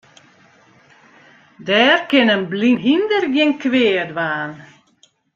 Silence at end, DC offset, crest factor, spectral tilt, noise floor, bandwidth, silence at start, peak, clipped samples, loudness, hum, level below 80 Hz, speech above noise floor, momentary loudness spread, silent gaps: 0.7 s; under 0.1%; 16 dB; -5.5 dB/octave; -57 dBFS; 7.4 kHz; 1.6 s; -2 dBFS; under 0.1%; -16 LUFS; none; -66 dBFS; 41 dB; 9 LU; none